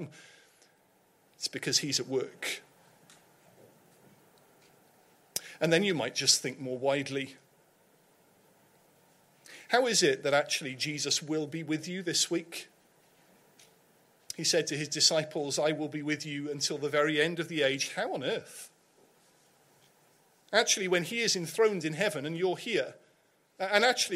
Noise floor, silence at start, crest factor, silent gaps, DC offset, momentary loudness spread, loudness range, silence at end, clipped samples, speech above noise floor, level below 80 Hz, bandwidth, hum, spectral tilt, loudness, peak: -68 dBFS; 0 s; 24 dB; none; under 0.1%; 12 LU; 6 LU; 0 s; under 0.1%; 38 dB; -80 dBFS; 16 kHz; none; -2.5 dB/octave; -29 LUFS; -8 dBFS